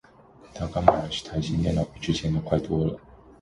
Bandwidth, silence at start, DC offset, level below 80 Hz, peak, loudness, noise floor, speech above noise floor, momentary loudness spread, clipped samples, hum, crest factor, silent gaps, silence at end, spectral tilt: 11 kHz; 0.45 s; under 0.1%; -42 dBFS; 0 dBFS; -26 LUFS; -52 dBFS; 27 dB; 11 LU; under 0.1%; none; 26 dB; none; 0.25 s; -6.5 dB/octave